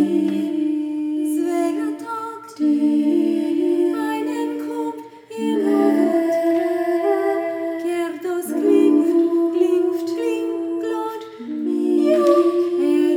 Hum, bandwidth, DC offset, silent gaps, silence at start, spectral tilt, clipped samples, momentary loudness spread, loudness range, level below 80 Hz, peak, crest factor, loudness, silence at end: none; 16.5 kHz; under 0.1%; none; 0 s; -6 dB/octave; under 0.1%; 11 LU; 2 LU; -78 dBFS; -4 dBFS; 16 dB; -20 LUFS; 0 s